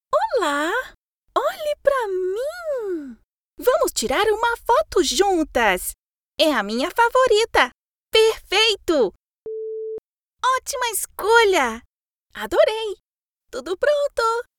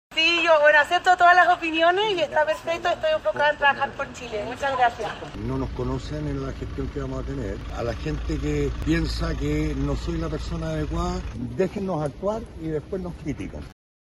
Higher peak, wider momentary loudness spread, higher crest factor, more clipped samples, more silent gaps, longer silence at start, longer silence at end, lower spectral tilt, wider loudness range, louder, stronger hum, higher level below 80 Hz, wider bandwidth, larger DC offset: first, -2 dBFS vs -6 dBFS; about the same, 15 LU vs 15 LU; about the same, 20 dB vs 18 dB; neither; first, 0.97-1.22 s, 3.24-3.53 s, 5.99-6.32 s, 7.74-8.07 s, 9.16-9.46 s, 9.98-10.31 s, 11.85-12.26 s, 13.00-13.36 s vs none; about the same, 0.1 s vs 0.1 s; second, 0.15 s vs 0.35 s; second, -2 dB/octave vs -5 dB/octave; second, 4 LU vs 10 LU; first, -20 LUFS vs -23 LUFS; neither; second, -50 dBFS vs -36 dBFS; first, over 20 kHz vs 13.5 kHz; neither